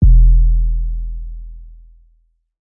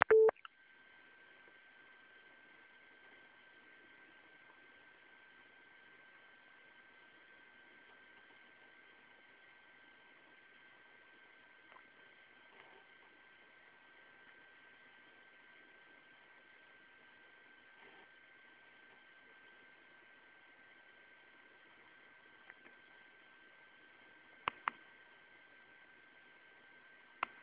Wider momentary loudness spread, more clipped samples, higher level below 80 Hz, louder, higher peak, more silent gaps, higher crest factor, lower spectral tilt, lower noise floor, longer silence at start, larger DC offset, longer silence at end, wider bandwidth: first, 23 LU vs 3 LU; neither; first, -14 dBFS vs -84 dBFS; first, -17 LUFS vs -36 LUFS; first, -2 dBFS vs -8 dBFS; neither; second, 12 dB vs 38 dB; first, -17.5 dB/octave vs -0.5 dB/octave; second, -58 dBFS vs -65 dBFS; about the same, 0 s vs 0.1 s; neither; second, 0.95 s vs 27.1 s; second, 0.5 kHz vs 4 kHz